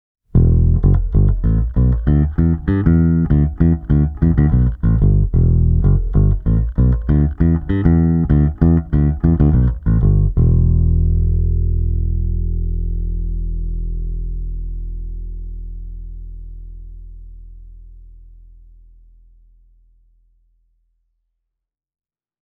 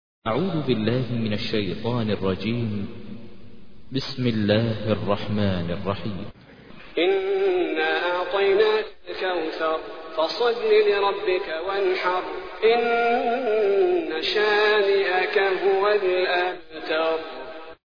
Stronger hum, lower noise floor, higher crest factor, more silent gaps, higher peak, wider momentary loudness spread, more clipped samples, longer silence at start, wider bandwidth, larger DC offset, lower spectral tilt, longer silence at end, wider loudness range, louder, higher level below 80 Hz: neither; first, -80 dBFS vs -48 dBFS; about the same, 16 dB vs 16 dB; neither; first, 0 dBFS vs -6 dBFS; first, 16 LU vs 13 LU; neither; first, 0.35 s vs 0.2 s; second, 3.3 kHz vs 5.4 kHz; second, under 0.1% vs 0.6%; first, -13 dB/octave vs -7 dB/octave; first, 4.25 s vs 0.15 s; first, 16 LU vs 6 LU; first, -16 LUFS vs -23 LUFS; first, -20 dBFS vs -54 dBFS